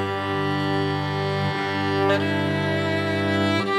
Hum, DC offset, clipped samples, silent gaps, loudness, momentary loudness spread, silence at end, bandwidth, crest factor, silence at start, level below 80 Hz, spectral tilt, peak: 50 Hz at -50 dBFS; under 0.1%; under 0.1%; none; -23 LUFS; 4 LU; 0 s; 14 kHz; 14 dB; 0 s; -64 dBFS; -6.5 dB/octave; -8 dBFS